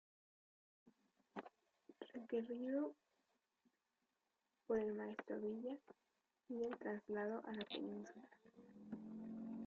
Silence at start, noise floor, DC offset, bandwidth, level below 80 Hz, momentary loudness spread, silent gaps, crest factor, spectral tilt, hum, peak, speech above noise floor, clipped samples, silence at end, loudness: 0.85 s; -89 dBFS; under 0.1%; 7.2 kHz; -86 dBFS; 17 LU; none; 18 dB; -4.5 dB/octave; none; -30 dBFS; 43 dB; under 0.1%; 0 s; -48 LUFS